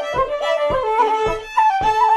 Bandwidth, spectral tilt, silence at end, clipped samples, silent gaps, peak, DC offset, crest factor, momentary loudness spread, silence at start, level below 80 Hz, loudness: 12.5 kHz; -4 dB/octave; 0 s; under 0.1%; none; -4 dBFS; under 0.1%; 12 dB; 4 LU; 0 s; -40 dBFS; -18 LUFS